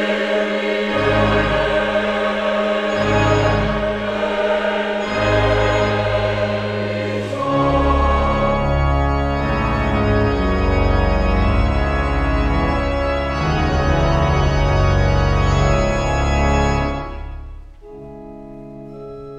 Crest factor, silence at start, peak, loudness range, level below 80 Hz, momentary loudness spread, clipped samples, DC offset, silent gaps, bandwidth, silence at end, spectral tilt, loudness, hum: 14 dB; 0 s; -4 dBFS; 1 LU; -24 dBFS; 7 LU; under 0.1%; under 0.1%; none; 9.2 kHz; 0 s; -6.5 dB/octave; -18 LUFS; none